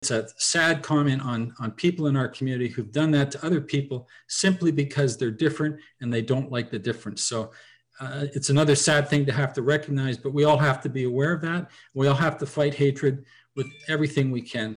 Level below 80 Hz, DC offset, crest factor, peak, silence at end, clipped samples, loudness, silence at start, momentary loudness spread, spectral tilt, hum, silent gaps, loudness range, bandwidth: -64 dBFS; under 0.1%; 14 dB; -12 dBFS; 0 s; under 0.1%; -25 LUFS; 0 s; 11 LU; -5 dB/octave; none; none; 4 LU; 10.5 kHz